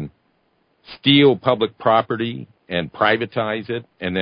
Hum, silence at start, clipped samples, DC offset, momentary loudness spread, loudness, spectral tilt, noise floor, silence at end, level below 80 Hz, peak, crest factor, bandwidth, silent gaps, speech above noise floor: none; 0 s; under 0.1%; under 0.1%; 14 LU; -19 LUFS; -10.5 dB/octave; -64 dBFS; 0 s; -54 dBFS; -2 dBFS; 18 dB; 5.2 kHz; none; 46 dB